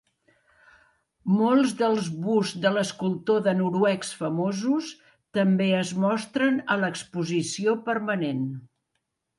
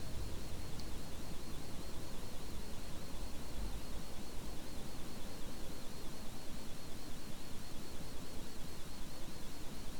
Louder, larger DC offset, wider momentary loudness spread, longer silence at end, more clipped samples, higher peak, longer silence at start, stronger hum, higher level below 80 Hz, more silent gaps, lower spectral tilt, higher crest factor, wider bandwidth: first, -25 LUFS vs -49 LUFS; neither; first, 7 LU vs 3 LU; first, 0.75 s vs 0 s; neither; first, -8 dBFS vs -28 dBFS; first, 1.25 s vs 0 s; neither; second, -72 dBFS vs -48 dBFS; neither; about the same, -5.5 dB/octave vs -4.5 dB/octave; first, 16 dB vs 10 dB; second, 11.5 kHz vs 19.5 kHz